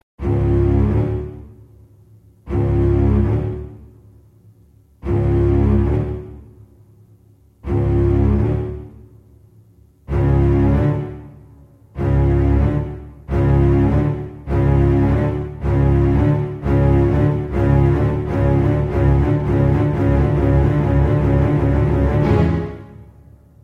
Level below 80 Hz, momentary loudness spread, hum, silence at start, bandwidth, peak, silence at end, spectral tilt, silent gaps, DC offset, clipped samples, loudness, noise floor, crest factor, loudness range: -24 dBFS; 12 LU; none; 0.2 s; 4.8 kHz; -4 dBFS; 0.6 s; -10.5 dB/octave; none; under 0.1%; under 0.1%; -17 LUFS; -50 dBFS; 14 dB; 5 LU